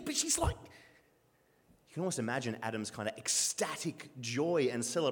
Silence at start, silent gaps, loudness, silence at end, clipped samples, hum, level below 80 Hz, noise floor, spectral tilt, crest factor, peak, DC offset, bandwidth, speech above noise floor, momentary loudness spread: 0 s; none; -34 LUFS; 0 s; under 0.1%; none; -54 dBFS; -70 dBFS; -3 dB/octave; 18 dB; -18 dBFS; under 0.1%; 19 kHz; 36 dB; 10 LU